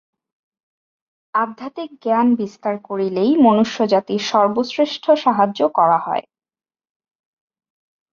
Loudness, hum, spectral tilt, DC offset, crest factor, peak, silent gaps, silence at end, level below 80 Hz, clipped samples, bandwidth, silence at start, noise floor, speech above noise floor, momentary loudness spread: -18 LUFS; none; -6 dB/octave; under 0.1%; 16 dB; -2 dBFS; none; 1.9 s; -66 dBFS; under 0.1%; 7.2 kHz; 1.35 s; under -90 dBFS; over 73 dB; 11 LU